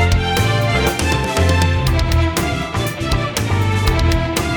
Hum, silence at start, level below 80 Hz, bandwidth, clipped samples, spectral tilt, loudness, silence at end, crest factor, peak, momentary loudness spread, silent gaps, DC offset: none; 0 s; -24 dBFS; over 20 kHz; under 0.1%; -5 dB/octave; -17 LUFS; 0 s; 14 dB; -2 dBFS; 4 LU; none; under 0.1%